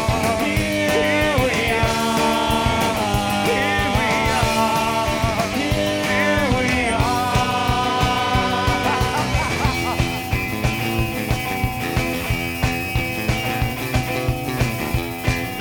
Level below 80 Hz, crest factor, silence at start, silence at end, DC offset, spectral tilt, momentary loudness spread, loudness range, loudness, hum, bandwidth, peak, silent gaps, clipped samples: -32 dBFS; 14 dB; 0 s; 0 s; under 0.1%; -4.5 dB/octave; 5 LU; 3 LU; -20 LUFS; none; 19.5 kHz; -6 dBFS; none; under 0.1%